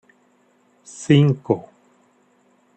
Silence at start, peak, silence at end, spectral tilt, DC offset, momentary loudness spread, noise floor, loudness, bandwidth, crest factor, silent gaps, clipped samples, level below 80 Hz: 1 s; -4 dBFS; 1.15 s; -7 dB/octave; under 0.1%; 20 LU; -60 dBFS; -18 LUFS; 8.8 kHz; 20 dB; none; under 0.1%; -62 dBFS